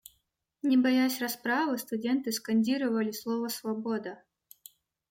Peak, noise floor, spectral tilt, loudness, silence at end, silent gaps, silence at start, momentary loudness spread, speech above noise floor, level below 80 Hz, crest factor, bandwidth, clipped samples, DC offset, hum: -16 dBFS; -77 dBFS; -4 dB/octave; -29 LUFS; 0.95 s; none; 0.65 s; 8 LU; 48 dB; -78 dBFS; 14 dB; 16.5 kHz; under 0.1%; under 0.1%; none